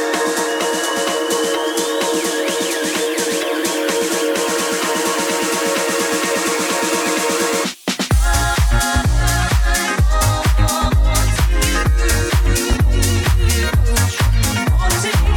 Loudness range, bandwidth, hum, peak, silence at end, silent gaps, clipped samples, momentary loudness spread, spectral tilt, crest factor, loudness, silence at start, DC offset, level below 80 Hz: 2 LU; 19 kHz; none; -2 dBFS; 0 s; none; under 0.1%; 2 LU; -4 dB/octave; 14 dB; -17 LUFS; 0 s; under 0.1%; -20 dBFS